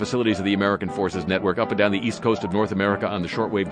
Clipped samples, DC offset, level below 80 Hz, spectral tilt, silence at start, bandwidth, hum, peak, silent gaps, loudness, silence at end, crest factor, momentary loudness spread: under 0.1%; under 0.1%; -54 dBFS; -6 dB/octave; 0 s; 10 kHz; none; -4 dBFS; none; -23 LUFS; 0 s; 18 dB; 4 LU